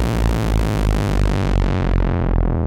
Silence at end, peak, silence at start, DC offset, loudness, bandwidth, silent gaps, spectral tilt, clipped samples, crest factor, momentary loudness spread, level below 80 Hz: 0 s; -4 dBFS; 0 s; under 0.1%; -19 LUFS; 15.5 kHz; none; -7 dB/octave; under 0.1%; 14 dB; 1 LU; -20 dBFS